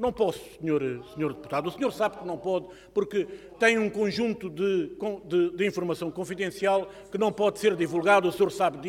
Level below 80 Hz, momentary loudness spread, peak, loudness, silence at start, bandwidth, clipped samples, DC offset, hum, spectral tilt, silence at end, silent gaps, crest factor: -60 dBFS; 10 LU; -8 dBFS; -27 LUFS; 0 s; 16 kHz; under 0.1%; under 0.1%; none; -5.5 dB/octave; 0 s; none; 18 dB